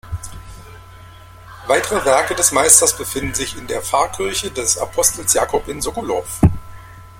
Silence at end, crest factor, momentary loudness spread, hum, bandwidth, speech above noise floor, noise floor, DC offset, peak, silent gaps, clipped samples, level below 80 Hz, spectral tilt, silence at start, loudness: 0 s; 18 dB; 14 LU; none; 16.5 kHz; 23 dB; -40 dBFS; under 0.1%; 0 dBFS; none; under 0.1%; -36 dBFS; -3 dB/octave; 0.05 s; -16 LUFS